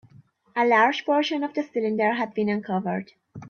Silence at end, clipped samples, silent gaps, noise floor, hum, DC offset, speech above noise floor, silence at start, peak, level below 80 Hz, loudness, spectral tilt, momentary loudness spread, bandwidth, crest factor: 0 s; under 0.1%; none; -55 dBFS; none; under 0.1%; 31 dB; 0.55 s; -8 dBFS; -72 dBFS; -24 LUFS; -6 dB/octave; 12 LU; 6.8 kHz; 18 dB